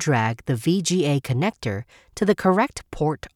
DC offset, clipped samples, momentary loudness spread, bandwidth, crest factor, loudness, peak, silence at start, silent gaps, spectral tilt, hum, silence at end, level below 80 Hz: under 0.1%; under 0.1%; 10 LU; 16.5 kHz; 16 dB; -23 LUFS; -6 dBFS; 0 s; none; -5.5 dB/octave; none; 0.1 s; -50 dBFS